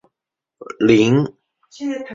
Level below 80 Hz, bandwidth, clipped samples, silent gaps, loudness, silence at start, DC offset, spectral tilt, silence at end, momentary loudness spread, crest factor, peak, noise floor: -54 dBFS; 7.6 kHz; under 0.1%; none; -17 LUFS; 0.6 s; under 0.1%; -6.5 dB/octave; 0 s; 15 LU; 18 dB; -2 dBFS; -84 dBFS